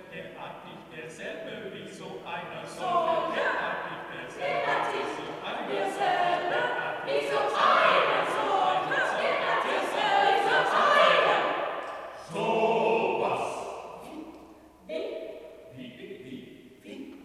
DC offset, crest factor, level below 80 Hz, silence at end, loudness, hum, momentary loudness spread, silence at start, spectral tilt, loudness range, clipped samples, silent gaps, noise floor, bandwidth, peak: under 0.1%; 20 dB; -68 dBFS; 0 s; -26 LUFS; none; 21 LU; 0 s; -3.5 dB/octave; 10 LU; under 0.1%; none; -51 dBFS; 14 kHz; -8 dBFS